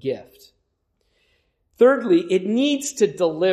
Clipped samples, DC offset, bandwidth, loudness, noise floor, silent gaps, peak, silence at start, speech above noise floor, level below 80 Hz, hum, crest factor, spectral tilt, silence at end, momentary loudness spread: under 0.1%; under 0.1%; 15 kHz; -19 LUFS; -71 dBFS; none; -4 dBFS; 0.05 s; 52 dB; -70 dBFS; none; 18 dB; -4.5 dB/octave; 0 s; 7 LU